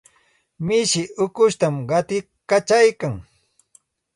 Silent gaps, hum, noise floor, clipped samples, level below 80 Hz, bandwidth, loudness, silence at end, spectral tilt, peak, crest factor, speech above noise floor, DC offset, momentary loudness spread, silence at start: none; none; -62 dBFS; under 0.1%; -56 dBFS; 11.5 kHz; -20 LUFS; 0.95 s; -4 dB/octave; -4 dBFS; 16 dB; 43 dB; under 0.1%; 12 LU; 0.6 s